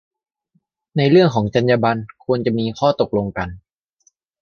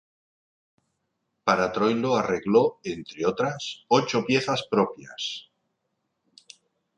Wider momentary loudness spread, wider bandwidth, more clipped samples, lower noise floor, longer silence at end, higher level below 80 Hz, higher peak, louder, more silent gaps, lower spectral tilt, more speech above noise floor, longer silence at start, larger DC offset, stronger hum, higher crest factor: about the same, 12 LU vs 11 LU; second, 6.8 kHz vs 9.8 kHz; neither; second, -66 dBFS vs -78 dBFS; second, 0.85 s vs 1.55 s; first, -48 dBFS vs -64 dBFS; first, -2 dBFS vs -6 dBFS; first, -18 LUFS vs -25 LUFS; neither; first, -7.5 dB/octave vs -5 dB/octave; second, 49 dB vs 53 dB; second, 0.95 s vs 1.45 s; neither; neither; about the same, 18 dB vs 20 dB